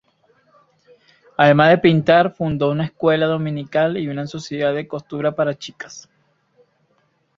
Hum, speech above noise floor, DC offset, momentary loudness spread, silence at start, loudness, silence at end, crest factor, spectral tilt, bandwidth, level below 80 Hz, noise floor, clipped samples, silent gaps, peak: none; 46 dB; under 0.1%; 18 LU; 1.4 s; -18 LUFS; 1.4 s; 18 dB; -6.5 dB/octave; 7.6 kHz; -58 dBFS; -64 dBFS; under 0.1%; none; -2 dBFS